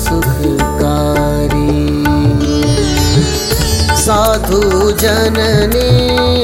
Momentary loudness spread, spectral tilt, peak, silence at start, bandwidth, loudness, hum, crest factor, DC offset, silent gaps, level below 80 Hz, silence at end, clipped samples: 3 LU; -5 dB/octave; 0 dBFS; 0 s; 17 kHz; -12 LUFS; none; 10 dB; under 0.1%; none; -20 dBFS; 0 s; under 0.1%